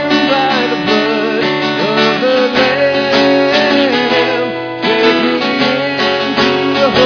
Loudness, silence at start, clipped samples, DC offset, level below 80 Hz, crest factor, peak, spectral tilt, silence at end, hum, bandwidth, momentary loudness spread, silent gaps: -12 LUFS; 0 s; under 0.1%; under 0.1%; -52 dBFS; 12 dB; 0 dBFS; -5 dB/octave; 0 s; none; 5.4 kHz; 3 LU; none